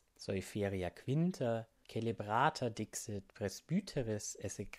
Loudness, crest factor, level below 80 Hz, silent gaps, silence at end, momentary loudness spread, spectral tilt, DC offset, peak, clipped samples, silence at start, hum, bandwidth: -39 LUFS; 22 dB; -64 dBFS; none; 0 s; 9 LU; -5.5 dB/octave; under 0.1%; -16 dBFS; under 0.1%; 0.2 s; none; 15 kHz